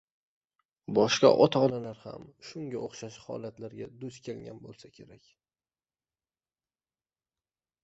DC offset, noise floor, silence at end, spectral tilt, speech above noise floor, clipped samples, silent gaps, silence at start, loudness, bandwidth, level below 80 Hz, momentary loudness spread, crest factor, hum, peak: under 0.1%; under -90 dBFS; 2.8 s; -5 dB/octave; over 60 dB; under 0.1%; none; 0.9 s; -26 LUFS; 8 kHz; -70 dBFS; 24 LU; 24 dB; none; -8 dBFS